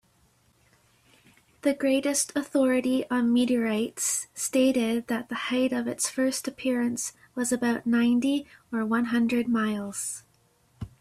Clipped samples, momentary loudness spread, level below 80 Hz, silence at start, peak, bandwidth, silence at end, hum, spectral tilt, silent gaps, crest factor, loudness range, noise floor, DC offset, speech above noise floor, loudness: under 0.1%; 8 LU; -64 dBFS; 1.65 s; -12 dBFS; 14.5 kHz; 0.15 s; none; -3.5 dB/octave; none; 16 dB; 2 LU; -65 dBFS; under 0.1%; 39 dB; -26 LUFS